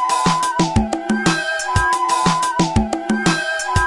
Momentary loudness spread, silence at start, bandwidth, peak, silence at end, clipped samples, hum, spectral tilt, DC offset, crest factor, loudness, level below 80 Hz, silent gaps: 3 LU; 0 s; 11.5 kHz; -2 dBFS; 0 s; under 0.1%; none; -4 dB/octave; under 0.1%; 16 dB; -18 LUFS; -34 dBFS; none